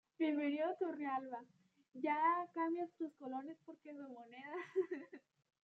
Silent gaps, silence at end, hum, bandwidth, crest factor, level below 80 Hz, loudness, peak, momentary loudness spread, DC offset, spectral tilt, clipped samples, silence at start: none; 0.45 s; none; 6.4 kHz; 18 dB; under -90 dBFS; -41 LUFS; -24 dBFS; 17 LU; under 0.1%; -6 dB/octave; under 0.1%; 0.2 s